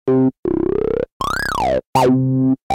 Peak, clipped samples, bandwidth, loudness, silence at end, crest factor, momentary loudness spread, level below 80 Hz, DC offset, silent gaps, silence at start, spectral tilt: -2 dBFS; under 0.1%; 16.5 kHz; -18 LUFS; 0 s; 16 dB; 6 LU; -38 dBFS; under 0.1%; 0.38-0.43 s, 1.12-1.20 s, 1.86-1.93 s, 2.62-2.70 s; 0.05 s; -7 dB/octave